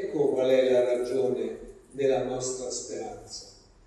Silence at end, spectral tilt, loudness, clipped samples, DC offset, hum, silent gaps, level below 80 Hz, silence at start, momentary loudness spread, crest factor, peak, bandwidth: 0.35 s; -4.5 dB/octave; -27 LUFS; under 0.1%; under 0.1%; none; none; -58 dBFS; 0 s; 18 LU; 16 dB; -12 dBFS; 12 kHz